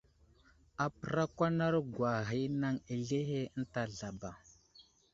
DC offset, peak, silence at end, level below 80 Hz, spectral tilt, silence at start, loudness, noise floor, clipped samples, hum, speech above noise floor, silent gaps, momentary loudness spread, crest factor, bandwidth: under 0.1%; -18 dBFS; 0.3 s; -64 dBFS; -6.5 dB/octave; 0.8 s; -36 LUFS; -66 dBFS; under 0.1%; none; 31 dB; none; 11 LU; 20 dB; 7.8 kHz